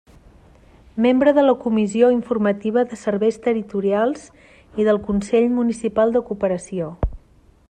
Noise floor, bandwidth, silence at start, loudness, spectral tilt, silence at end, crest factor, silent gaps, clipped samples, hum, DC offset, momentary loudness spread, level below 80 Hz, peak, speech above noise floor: -52 dBFS; 9.6 kHz; 0.95 s; -19 LUFS; -6.5 dB/octave; 0.55 s; 16 dB; none; under 0.1%; none; under 0.1%; 11 LU; -40 dBFS; -2 dBFS; 34 dB